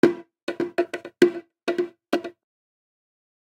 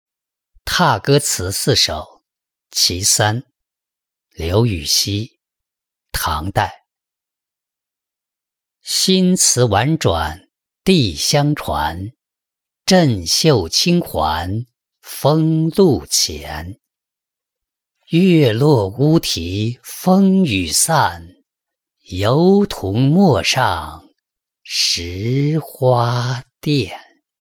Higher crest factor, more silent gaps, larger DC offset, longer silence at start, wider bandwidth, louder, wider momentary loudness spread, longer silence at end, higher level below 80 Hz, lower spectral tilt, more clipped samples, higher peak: first, 26 dB vs 16 dB; first, 0.43-0.47 s vs none; neither; second, 0.05 s vs 0.65 s; second, 16 kHz vs over 20 kHz; second, -26 LUFS vs -16 LUFS; about the same, 12 LU vs 13 LU; first, 1.2 s vs 0.45 s; second, -70 dBFS vs -44 dBFS; about the same, -5.5 dB/octave vs -4.5 dB/octave; neither; about the same, 0 dBFS vs -2 dBFS